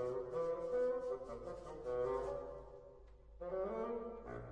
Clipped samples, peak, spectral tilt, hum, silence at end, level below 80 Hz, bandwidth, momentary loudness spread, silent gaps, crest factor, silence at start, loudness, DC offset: under 0.1%; -28 dBFS; -7.5 dB/octave; none; 0 s; -60 dBFS; 9.4 kHz; 16 LU; none; 14 dB; 0 s; -43 LUFS; under 0.1%